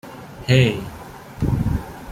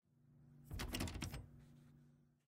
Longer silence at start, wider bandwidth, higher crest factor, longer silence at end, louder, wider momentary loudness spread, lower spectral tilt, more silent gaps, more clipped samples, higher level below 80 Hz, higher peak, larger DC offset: second, 0.05 s vs 0.25 s; about the same, 15 kHz vs 16 kHz; about the same, 18 dB vs 22 dB; second, 0 s vs 0.3 s; first, -20 LUFS vs -48 LUFS; about the same, 21 LU vs 23 LU; first, -6.5 dB/octave vs -4 dB/octave; neither; neither; first, -34 dBFS vs -58 dBFS; first, -4 dBFS vs -28 dBFS; neither